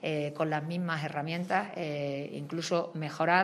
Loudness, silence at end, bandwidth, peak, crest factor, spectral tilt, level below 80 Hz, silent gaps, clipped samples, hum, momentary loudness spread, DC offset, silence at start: -33 LUFS; 0 s; 13.5 kHz; -10 dBFS; 22 dB; -5.5 dB/octave; -78 dBFS; none; under 0.1%; none; 5 LU; under 0.1%; 0 s